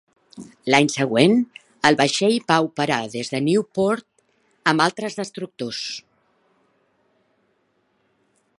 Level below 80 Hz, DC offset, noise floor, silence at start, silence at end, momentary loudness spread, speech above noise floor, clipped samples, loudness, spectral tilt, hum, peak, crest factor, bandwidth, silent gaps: -68 dBFS; under 0.1%; -67 dBFS; 0.35 s; 2.6 s; 13 LU; 47 dB; under 0.1%; -21 LUFS; -4.5 dB/octave; none; 0 dBFS; 22 dB; 11.5 kHz; none